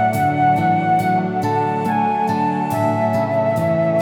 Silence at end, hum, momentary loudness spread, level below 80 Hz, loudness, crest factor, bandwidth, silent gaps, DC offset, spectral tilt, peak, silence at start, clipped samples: 0 s; none; 3 LU; -58 dBFS; -18 LUFS; 12 dB; 19 kHz; none; under 0.1%; -7.5 dB/octave; -6 dBFS; 0 s; under 0.1%